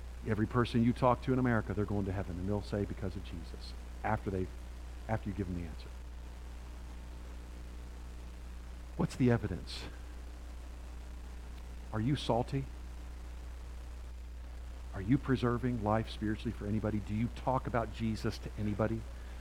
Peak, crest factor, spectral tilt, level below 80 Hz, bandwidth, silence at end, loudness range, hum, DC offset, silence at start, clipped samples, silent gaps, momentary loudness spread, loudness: -14 dBFS; 22 dB; -7.5 dB/octave; -44 dBFS; 15.5 kHz; 0 s; 9 LU; none; under 0.1%; 0 s; under 0.1%; none; 17 LU; -35 LUFS